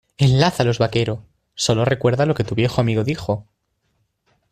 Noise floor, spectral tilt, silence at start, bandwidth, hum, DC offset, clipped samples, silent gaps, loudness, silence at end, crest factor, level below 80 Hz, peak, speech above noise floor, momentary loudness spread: -69 dBFS; -6 dB/octave; 0.2 s; 14 kHz; none; under 0.1%; under 0.1%; none; -19 LUFS; 1.1 s; 18 dB; -46 dBFS; -2 dBFS; 51 dB; 10 LU